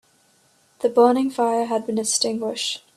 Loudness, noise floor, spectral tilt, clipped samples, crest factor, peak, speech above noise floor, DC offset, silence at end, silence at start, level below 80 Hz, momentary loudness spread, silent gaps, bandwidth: -21 LUFS; -60 dBFS; -2.5 dB/octave; under 0.1%; 20 dB; -2 dBFS; 39 dB; under 0.1%; 0.2 s; 0.8 s; -70 dBFS; 8 LU; none; 13.5 kHz